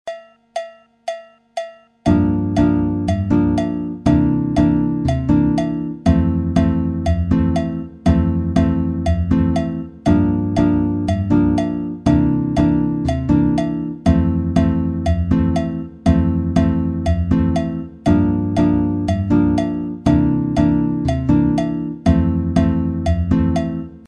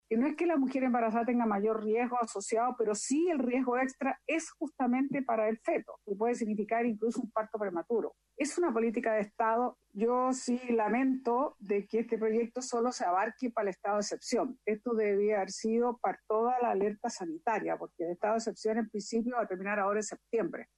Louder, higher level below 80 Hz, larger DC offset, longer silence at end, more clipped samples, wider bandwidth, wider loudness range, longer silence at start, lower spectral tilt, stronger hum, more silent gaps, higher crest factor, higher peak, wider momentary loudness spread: first, -17 LUFS vs -32 LUFS; first, -28 dBFS vs -74 dBFS; neither; about the same, 0.1 s vs 0.15 s; neither; second, 9.8 kHz vs 11.5 kHz; about the same, 1 LU vs 2 LU; about the same, 0.05 s vs 0.1 s; first, -8.5 dB/octave vs -5 dB/octave; neither; neither; about the same, 12 dB vs 14 dB; first, -4 dBFS vs -18 dBFS; about the same, 7 LU vs 5 LU